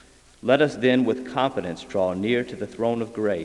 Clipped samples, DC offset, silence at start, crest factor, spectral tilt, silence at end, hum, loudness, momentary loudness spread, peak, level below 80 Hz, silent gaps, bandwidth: under 0.1%; under 0.1%; 0.45 s; 20 dB; -6 dB/octave; 0 s; none; -24 LUFS; 9 LU; -4 dBFS; -58 dBFS; none; 11 kHz